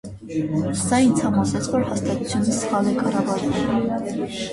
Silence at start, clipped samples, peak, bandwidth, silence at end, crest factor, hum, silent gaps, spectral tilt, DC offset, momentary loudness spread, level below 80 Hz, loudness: 0.05 s; under 0.1%; -6 dBFS; 11.5 kHz; 0 s; 14 dB; none; none; -5.5 dB/octave; under 0.1%; 8 LU; -46 dBFS; -22 LUFS